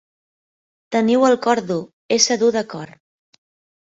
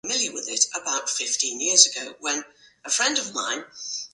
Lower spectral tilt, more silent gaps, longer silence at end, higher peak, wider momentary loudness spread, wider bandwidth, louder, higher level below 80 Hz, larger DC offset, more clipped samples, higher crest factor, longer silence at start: first, -3 dB/octave vs 1.5 dB/octave; first, 1.93-2.09 s vs none; first, 0.95 s vs 0.05 s; about the same, -2 dBFS vs 0 dBFS; about the same, 15 LU vs 14 LU; second, 8 kHz vs 11.5 kHz; first, -18 LUFS vs -22 LUFS; first, -66 dBFS vs -76 dBFS; neither; neither; about the same, 20 dB vs 24 dB; first, 0.9 s vs 0.05 s